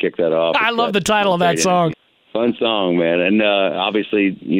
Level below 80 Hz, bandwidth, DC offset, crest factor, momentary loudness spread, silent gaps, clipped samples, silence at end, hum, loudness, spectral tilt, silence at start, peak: -56 dBFS; 16 kHz; under 0.1%; 14 dB; 4 LU; none; under 0.1%; 0 s; none; -17 LUFS; -4.5 dB/octave; 0 s; -2 dBFS